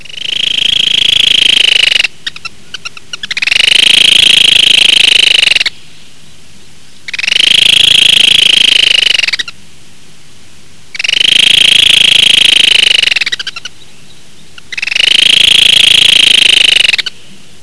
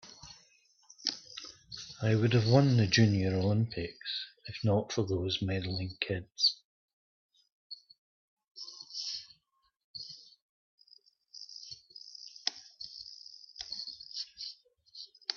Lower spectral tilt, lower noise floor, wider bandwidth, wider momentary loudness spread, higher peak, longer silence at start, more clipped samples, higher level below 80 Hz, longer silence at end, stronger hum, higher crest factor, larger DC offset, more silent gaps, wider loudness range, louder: second, 1 dB/octave vs -5.5 dB/octave; second, -39 dBFS vs -76 dBFS; first, 11 kHz vs 7 kHz; second, 18 LU vs 23 LU; first, 0 dBFS vs -10 dBFS; first, 0.2 s vs 0.05 s; first, 4% vs under 0.1%; first, -40 dBFS vs -66 dBFS; first, 0.55 s vs 0 s; neither; second, 8 dB vs 24 dB; first, 4% vs under 0.1%; second, none vs 6.65-7.29 s, 7.52-7.70 s, 7.98-8.37 s, 9.84-9.94 s, 10.42-10.78 s; second, 3 LU vs 16 LU; first, -4 LUFS vs -32 LUFS